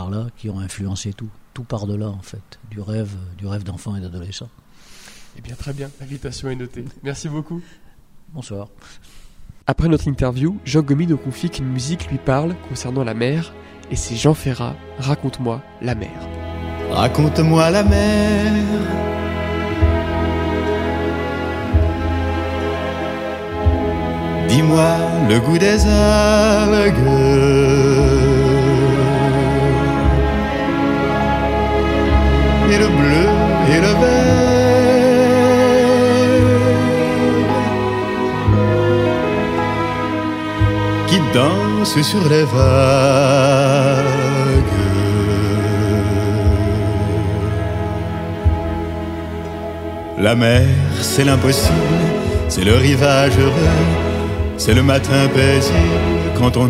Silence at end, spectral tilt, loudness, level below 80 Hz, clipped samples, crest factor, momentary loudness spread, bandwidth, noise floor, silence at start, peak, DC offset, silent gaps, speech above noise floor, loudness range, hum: 0 s; -6 dB/octave; -16 LUFS; -26 dBFS; under 0.1%; 16 dB; 15 LU; 16 kHz; -41 dBFS; 0 s; 0 dBFS; under 0.1%; none; 26 dB; 15 LU; none